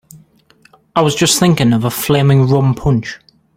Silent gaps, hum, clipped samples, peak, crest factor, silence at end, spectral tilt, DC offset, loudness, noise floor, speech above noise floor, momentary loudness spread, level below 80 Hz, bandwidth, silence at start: none; none; under 0.1%; 0 dBFS; 14 dB; 0.4 s; -5 dB/octave; under 0.1%; -13 LUFS; -51 dBFS; 38 dB; 7 LU; -38 dBFS; 16.5 kHz; 0.15 s